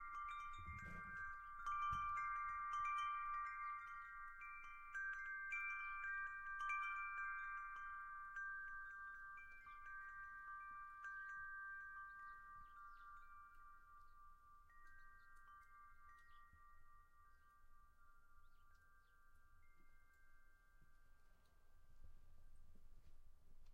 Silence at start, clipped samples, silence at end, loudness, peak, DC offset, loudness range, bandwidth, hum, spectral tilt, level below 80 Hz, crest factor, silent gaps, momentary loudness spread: 0 s; under 0.1%; 0 s; -49 LUFS; -36 dBFS; under 0.1%; 20 LU; 16 kHz; none; -3 dB/octave; -68 dBFS; 18 dB; none; 21 LU